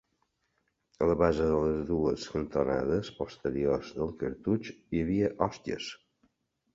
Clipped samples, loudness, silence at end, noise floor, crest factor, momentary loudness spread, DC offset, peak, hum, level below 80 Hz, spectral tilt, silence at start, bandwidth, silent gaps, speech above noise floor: under 0.1%; -31 LUFS; 0.8 s; -77 dBFS; 20 dB; 10 LU; under 0.1%; -10 dBFS; none; -50 dBFS; -7 dB/octave; 1 s; 7.8 kHz; none; 47 dB